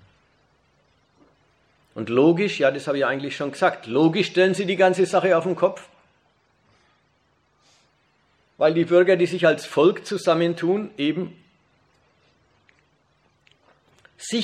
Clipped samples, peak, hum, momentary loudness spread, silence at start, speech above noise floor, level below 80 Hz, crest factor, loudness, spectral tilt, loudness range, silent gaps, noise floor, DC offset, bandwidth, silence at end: under 0.1%; -6 dBFS; none; 10 LU; 1.95 s; 45 dB; -72 dBFS; 18 dB; -21 LUFS; -5.5 dB/octave; 10 LU; none; -65 dBFS; under 0.1%; 11 kHz; 0 s